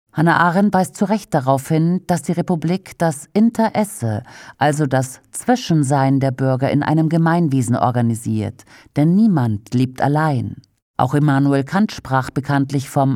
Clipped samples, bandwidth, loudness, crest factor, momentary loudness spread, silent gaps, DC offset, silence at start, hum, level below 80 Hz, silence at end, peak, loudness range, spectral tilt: under 0.1%; 15.5 kHz; -18 LUFS; 16 dB; 7 LU; 10.82-10.94 s; under 0.1%; 0.15 s; none; -54 dBFS; 0 s; -2 dBFS; 2 LU; -7 dB/octave